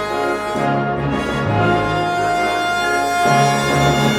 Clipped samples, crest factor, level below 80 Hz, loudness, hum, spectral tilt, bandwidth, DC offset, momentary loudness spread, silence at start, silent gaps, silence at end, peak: under 0.1%; 12 dB; -38 dBFS; -17 LUFS; none; -5 dB/octave; 17 kHz; under 0.1%; 5 LU; 0 s; none; 0 s; -4 dBFS